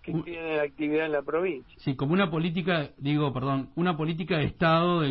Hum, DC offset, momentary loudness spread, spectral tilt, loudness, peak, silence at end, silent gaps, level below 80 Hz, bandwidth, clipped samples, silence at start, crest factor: none; under 0.1%; 8 LU; -11 dB/octave; -27 LUFS; -10 dBFS; 0 s; none; -54 dBFS; 5.8 kHz; under 0.1%; 0.05 s; 16 dB